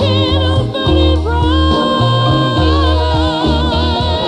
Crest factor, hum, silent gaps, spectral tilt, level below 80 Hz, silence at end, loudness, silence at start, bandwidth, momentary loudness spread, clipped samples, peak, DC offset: 10 dB; none; none; -7 dB/octave; -18 dBFS; 0 s; -13 LUFS; 0 s; 9.4 kHz; 2 LU; under 0.1%; -2 dBFS; under 0.1%